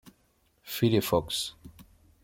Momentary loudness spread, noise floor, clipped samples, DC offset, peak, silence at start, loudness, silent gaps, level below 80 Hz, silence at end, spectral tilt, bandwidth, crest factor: 12 LU; -69 dBFS; under 0.1%; under 0.1%; -10 dBFS; 0.65 s; -28 LUFS; none; -56 dBFS; 0.4 s; -5 dB/octave; 17 kHz; 20 dB